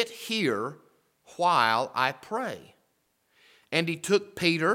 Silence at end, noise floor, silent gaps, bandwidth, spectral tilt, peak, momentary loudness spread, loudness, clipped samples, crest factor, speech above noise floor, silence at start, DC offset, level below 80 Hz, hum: 0 s; -72 dBFS; none; 17.5 kHz; -4 dB/octave; -6 dBFS; 13 LU; -27 LUFS; under 0.1%; 22 dB; 45 dB; 0 s; under 0.1%; -74 dBFS; none